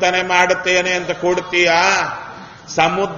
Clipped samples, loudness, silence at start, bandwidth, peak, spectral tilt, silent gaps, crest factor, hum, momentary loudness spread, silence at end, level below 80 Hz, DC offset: under 0.1%; -15 LUFS; 0 s; 7.4 kHz; 0 dBFS; -3 dB/octave; none; 16 dB; none; 13 LU; 0 s; -52 dBFS; under 0.1%